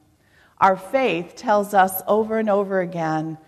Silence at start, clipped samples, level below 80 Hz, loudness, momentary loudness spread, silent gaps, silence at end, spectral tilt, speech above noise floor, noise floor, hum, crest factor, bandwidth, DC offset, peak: 0.6 s; under 0.1%; -62 dBFS; -20 LUFS; 6 LU; none; 0.1 s; -5.5 dB/octave; 36 dB; -57 dBFS; none; 18 dB; 14 kHz; under 0.1%; -4 dBFS